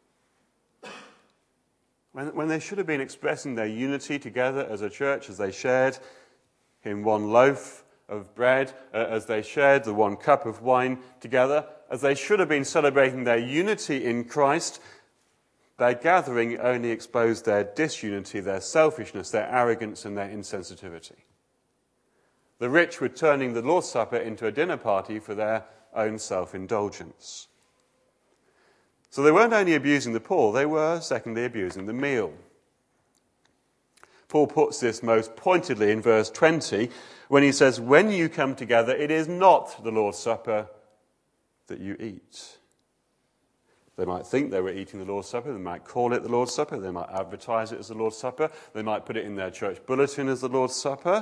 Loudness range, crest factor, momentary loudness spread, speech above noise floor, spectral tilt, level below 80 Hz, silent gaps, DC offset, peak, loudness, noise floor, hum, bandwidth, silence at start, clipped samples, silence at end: 10 LU; 24 dB; 15 LU; 47 dB; -5 dB/octave; -70 dBFS; none; under 0.1%; -2 dBFS; -25 LUFS; -72 dBFS; none; 11 kHz; 0.85 s; under 0.1%; 0 s